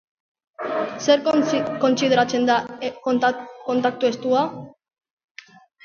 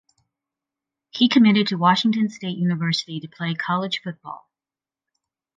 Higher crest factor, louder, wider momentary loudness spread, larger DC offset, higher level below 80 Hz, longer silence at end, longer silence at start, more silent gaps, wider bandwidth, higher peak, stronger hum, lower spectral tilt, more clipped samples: about the same, 18 dB vs 20 dB; about the same, -21 LUFS vs -20 LUFS; second, 10 LU vs 19 LU; neither; about the same, -68 dBFS vs -72 dBFS; about the same, 1.15 s vs 1.2 s; second, 0.6 s vs 1.15 s; neither; about the same, 7.2 kHz vs 7.6 kHz; about the same, -4 dBFS vs -4 dBFS; neither; about the same, -4.5 dB/octave vs -5.5 dB/octave; neither